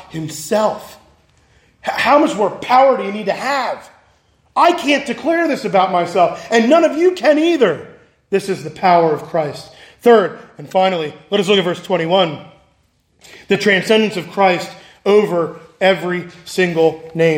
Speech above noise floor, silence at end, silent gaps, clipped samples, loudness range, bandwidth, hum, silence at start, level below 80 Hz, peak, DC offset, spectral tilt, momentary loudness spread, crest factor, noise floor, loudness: 44 dB; 0 s; none; under 0.1%; 2 LU; 16.5 kHz; none; 0.1 s; -60 dBFS; 0 dBFS; under 0.1%; -5 dB/octave; 12 LU; 16 dB; -59 dBFS; -15 LUFS